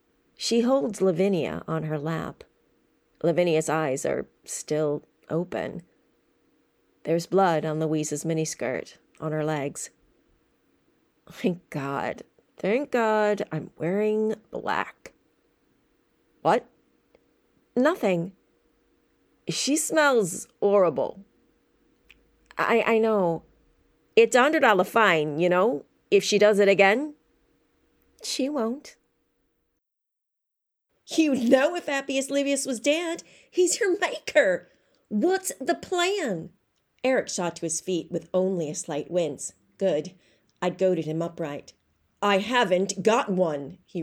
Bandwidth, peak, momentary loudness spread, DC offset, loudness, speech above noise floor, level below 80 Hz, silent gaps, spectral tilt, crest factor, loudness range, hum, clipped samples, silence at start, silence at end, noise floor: 16 kHz; -6 dBFS; 13 LU; under 0.1%; -25 LUFS; 59 dB; -68 dBFS; none; -4.5 dB/octave; 20 dB; 9 LU; none; under 0.1%; 0.4 s; 0 s; -83 dBFS